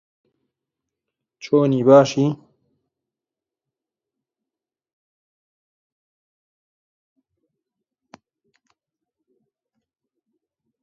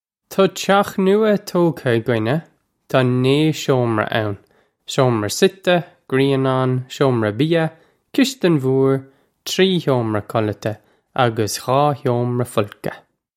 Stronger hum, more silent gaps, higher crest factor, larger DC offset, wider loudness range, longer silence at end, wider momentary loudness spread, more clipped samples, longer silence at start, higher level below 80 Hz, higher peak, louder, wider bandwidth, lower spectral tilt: neither; neither; first, 26 dB vs 18 dB; neither; first, 10 LU vs 2 LU; first, 8.45 s vs 0.4 s; about the same, 10 LU vs 9 LU; neither; first, 1.45 s vs 0.3 s; second, -72 dBFS vs -58 dBFS; about the same, 0 dBFS vs 0 dBFS; about the same, -16 LUFS vs -18 LUFS; second, 7.4 kHz vs 16 kHz; about the same, -7 dB/octave vs -6 dB/octave